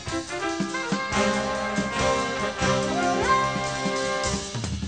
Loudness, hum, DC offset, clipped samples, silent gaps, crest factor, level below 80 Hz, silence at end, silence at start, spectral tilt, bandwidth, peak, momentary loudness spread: -25 LUFS; none; 0.1%; under 0.1%; none; 16 dB; -44 dBFS; 0 s; 0 s; -4 dB/octave; 9.4 kHz; -10 dBFS; 6 LU